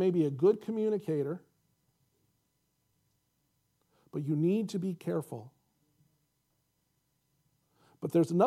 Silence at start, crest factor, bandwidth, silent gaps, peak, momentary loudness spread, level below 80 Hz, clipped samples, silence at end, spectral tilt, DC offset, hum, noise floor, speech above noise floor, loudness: 0 s; 22 dB; 14.5 kHz; none; -12 dBFS; 15 LU; -82 dBFS; under 0.1%; 0 s; -8.5 dB/octave; under 0.1%; 60 Hz at -60 dBFS; -78 dBFS; 48 dB; -32 LUFS